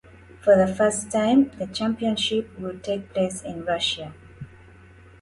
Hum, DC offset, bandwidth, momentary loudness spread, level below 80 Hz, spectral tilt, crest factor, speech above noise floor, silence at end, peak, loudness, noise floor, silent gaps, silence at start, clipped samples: none; under 0.1%; 11.5 kHz; 20 LU; -54 dBFS; -4.5 dB/octave; 18 dB; 26 dB; 0.75 s; -6 dBFS; -23 LUFS; -49 dBFS; none; 0.45 s; under 0.1%